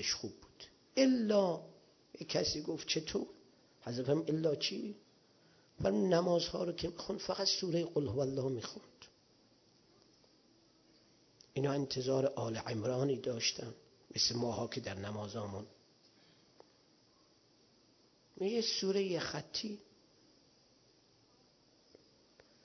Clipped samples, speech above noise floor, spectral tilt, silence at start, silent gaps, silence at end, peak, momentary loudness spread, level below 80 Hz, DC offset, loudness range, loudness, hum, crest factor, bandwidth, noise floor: under 0.1%; 33 dB; -4.5 dB/octave; 0 s; none; 2.8 s; -16 dBFS; 16 LU; -66 dBFS; under 0.1%; 11 LU; -36 LUFS; none; 22 dB; 6.4 kHz; -69 dBFS